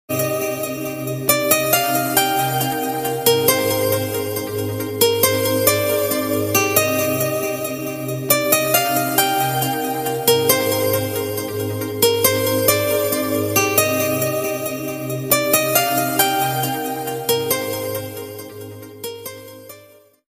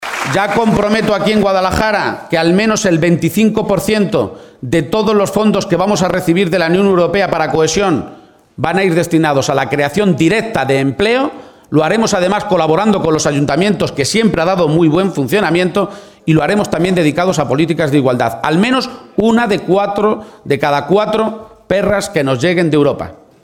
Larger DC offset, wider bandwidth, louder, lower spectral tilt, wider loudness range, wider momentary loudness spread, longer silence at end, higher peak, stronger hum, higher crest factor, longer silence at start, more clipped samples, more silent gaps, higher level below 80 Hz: neither; about the same, 16 kHz vs 17.5 kHz; second, -18 LUFS vs -13 LUFS; second, -3 dB/octave vs -5.5 dB/octave; about the same, 2 LU vs 1 LU; first, 10 LU vs 5 LU; first, 0.5 s vs 0.3 s; about the same, 0 dBFS vs 0 dBFS; neither; first, 18 dB vs 12 dB; about the same, 0.1 s vs 0 s; neither; neither; second, -56 dBFS vs -42 dBFS